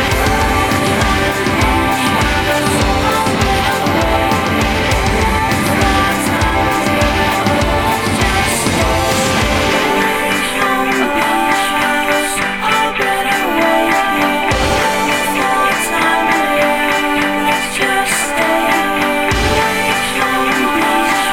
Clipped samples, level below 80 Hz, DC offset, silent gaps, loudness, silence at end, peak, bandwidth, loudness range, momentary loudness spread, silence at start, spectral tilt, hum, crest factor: under 0.1%; -26 dBFS; under 0.1%; none; -13 LUFS; 0 s; 0 dBFS; 18 kHz; 0 LU; 1 LU; 0 s; -4 dB/octave; none; 14 dB